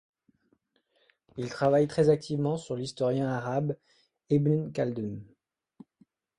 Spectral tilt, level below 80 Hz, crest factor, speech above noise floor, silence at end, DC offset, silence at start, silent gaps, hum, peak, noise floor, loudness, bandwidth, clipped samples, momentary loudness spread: -7.5 dB/octave; -66 dBFS; 20 dB; 44 dB; 1.15 s; under 0.1%; 1.35 s; none; none; -10 dBFS; -72 dBFS; -29 LUFS; 10.5 kHz; under 0.1%; 14 LU